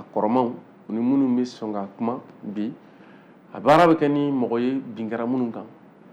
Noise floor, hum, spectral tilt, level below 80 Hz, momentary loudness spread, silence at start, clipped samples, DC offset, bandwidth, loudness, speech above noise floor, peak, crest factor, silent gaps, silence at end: -49 dBFS; none; -7.5 dB/octave; -64 dBFS; 16 LU; 0 s; under 0.1%; under 0.1%; 10.5 kHz; -23 LUFS; 26 dB; -6 dBFS; 16 dB; none; 0.4 s